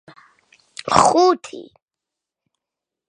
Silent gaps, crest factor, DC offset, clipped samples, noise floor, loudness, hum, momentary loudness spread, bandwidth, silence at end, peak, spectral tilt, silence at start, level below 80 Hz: none; 22 dB; under 0.1%; under 0.1%; -86 dBFS; -16 LUFS; none; 24 LU; 10.5 kHz; 1.45 s; 0 dBFS; -4 dB/octave; 0.85 s; -54 dBFS